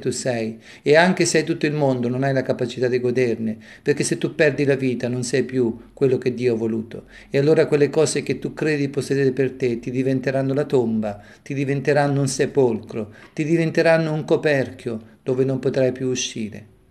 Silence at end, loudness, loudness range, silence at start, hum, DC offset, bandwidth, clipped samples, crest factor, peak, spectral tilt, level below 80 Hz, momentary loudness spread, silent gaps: 0.25 s; -21 LUFS; 2 LU; 0 s; none; under 0.1%; 13 kHz; under 0.1%; 18 dB; -2 dBFS; -5.5 dB/octave; -58 dBFS; 11 LU; none